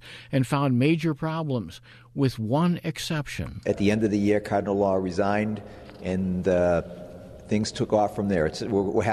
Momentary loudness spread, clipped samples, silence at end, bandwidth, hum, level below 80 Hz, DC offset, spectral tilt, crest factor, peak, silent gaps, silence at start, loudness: 13 LU; under 0.1%; 0 s; 13.5 kHz; none; -50 dBFS; under 0.1%; -6.5 dB/octave; 16 dB; -8 dBFS; none; 0.05 s; -25 LUFS